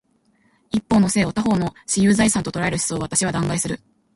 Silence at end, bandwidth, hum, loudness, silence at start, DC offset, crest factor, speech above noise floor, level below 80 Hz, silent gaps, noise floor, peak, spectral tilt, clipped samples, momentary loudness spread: 0.4 s; 12 kHz; none; -20 LUFS; 0.75 s; under 0.1%; 16 dB; 42 dB; -46 dBFS; none; -62 dBFS; -4 dBFS; -4.5 dB/octave; under 0.1%; 9 LU